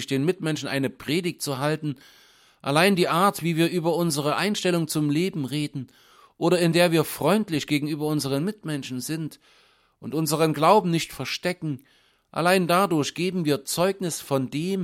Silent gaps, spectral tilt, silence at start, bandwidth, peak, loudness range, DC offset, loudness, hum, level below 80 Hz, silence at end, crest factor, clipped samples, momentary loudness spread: none; -5 dB/octave; 0 s; 16.5 kHz; -4 dBFS; 2 LU; under 0.1%; -24 LUFS; none; -64 dBFS; 0 s; 20 dB; under 0.1%; 12 LU